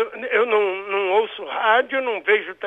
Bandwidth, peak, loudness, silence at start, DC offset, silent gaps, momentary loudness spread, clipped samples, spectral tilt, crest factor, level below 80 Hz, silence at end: 3.9 kHz; -4 dBFS; -20 LUFS; 0 s; under 0.1%; none; 5 LU; under 0.1%; -4.5 dB/octave; 16 dB; -72 dBFS; 0 s